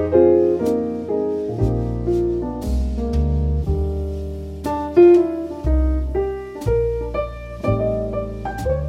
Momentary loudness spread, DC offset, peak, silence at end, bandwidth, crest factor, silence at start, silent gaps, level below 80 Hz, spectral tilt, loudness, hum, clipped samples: 12 LU; under 0.1%; -2 dBFS; 0 s; 11 kHz; 16 dB; 0 s; none; -26 dBFS; -9.5 dB/octave; -20 LUFS; none; under 0.1%